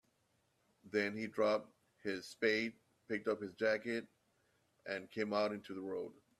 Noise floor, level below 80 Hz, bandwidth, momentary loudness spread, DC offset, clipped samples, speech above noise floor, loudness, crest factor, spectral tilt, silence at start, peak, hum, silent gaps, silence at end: -79 dBFS; -82 dBFS; 13 kHz; 10 LU; under 0.1%; under 0.1%; 40 dB; -39 LUFS; 20 dB; -5 dB/octave; 0.85 s; -20 dBFS; none; none; 0.25 s